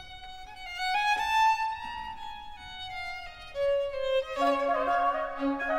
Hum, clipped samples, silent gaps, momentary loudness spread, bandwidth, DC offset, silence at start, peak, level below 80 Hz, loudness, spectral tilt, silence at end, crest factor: none; under 0.1%; none; 17 LU; 16.5 kHz; under 0.1%; 0 s; -16 dBFS; -52 dBFS; -29 LUFS; -3 dB/octave; 0 s; 14 dB